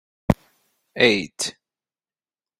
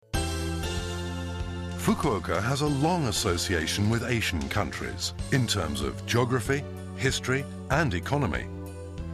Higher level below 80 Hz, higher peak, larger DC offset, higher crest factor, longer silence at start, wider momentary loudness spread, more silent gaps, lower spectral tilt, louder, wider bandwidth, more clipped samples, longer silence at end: about the same, -46 dBFS vs -42 dBFS; first, -2 dBFS vs -10 dBFS; neither; first, 24 dB vs 18 dB; first, 0.3 s vs 0.15 s; first, 11 LU vs 8 LU; neither; about the same, -4 dB/octave vs -4.5 dB/octave; first, -22 LUFS vs -28 LUFS; first, 16 kHz vs 14 kHz; neither; first, 1.1 s vs 0 s